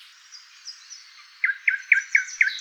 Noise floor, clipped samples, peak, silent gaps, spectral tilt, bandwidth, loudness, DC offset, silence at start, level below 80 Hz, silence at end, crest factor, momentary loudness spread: -48 dBFS; under 0.1%; -4 dBFS; none; 10 dB/octave; 14 kHz; -21 LUFS; under 0.1%; 0.35 s; -84 dBFS; 0 s; 22 dB; 23 LU